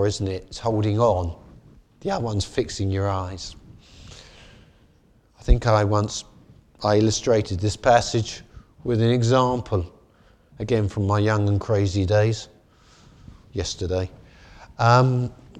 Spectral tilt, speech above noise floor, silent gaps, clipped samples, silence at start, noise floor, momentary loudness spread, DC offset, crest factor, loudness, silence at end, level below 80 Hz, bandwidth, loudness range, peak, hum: -6 dB/octave; 37 dB; none; under 0.1%; 0 s; -58 dBFS; 16 LU; under 0.1%; 20 dB; -22 LUFS; 0 s; -36 dBFS; 9.8 kHz; 7 LU; -2 dBFS; none